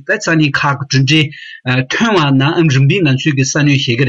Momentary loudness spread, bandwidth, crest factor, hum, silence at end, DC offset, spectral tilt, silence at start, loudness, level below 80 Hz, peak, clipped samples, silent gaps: 5 LU; 7.8 kHz; 12 dB; none; 0 s; under 0.1%; -5 dB/octave; 0.1 s; -12 LUFS; -52 dBFS; 0 dBFS; under 0.1%; none